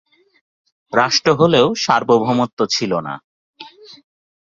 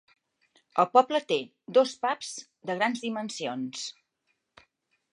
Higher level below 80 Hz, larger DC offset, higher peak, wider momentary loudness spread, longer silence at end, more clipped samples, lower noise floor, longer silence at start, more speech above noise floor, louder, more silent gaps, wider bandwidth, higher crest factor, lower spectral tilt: first, -56 dBFS vs -84 dBFS; neither; first, 0 dBFS vs -6 dBFS; about the same, 13 LU vs 14 LU; second, 0.5 s vs 1.2 s; neither; second, -40 dBFS vs -77 dBFS; first, 0.9 s vs 0.75 s; second, 25 dB vs 50 dB; first, -16 LUFS vs -28 LUFS; first, 2.53-2.57 s, 3.24-3.54 s vs none; second, 7.6 kHz vs 11 kHz; about the same, 18 dB vs 22 dB; about the same, -4.5 dB/octave vs -3.5 dB/octave